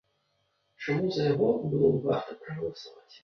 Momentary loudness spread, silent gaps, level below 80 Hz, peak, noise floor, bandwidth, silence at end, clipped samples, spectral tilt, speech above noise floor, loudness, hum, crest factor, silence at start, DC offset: 14 LU; none; -64 dBFS; -12 dBFS; -74 dBFS; 6.6 kHz; 0.05 s; under 0.1%; -8 dB/octave; 46 dB; -28 LUFS; none; 18 dB; 0.8 s; under 0.1%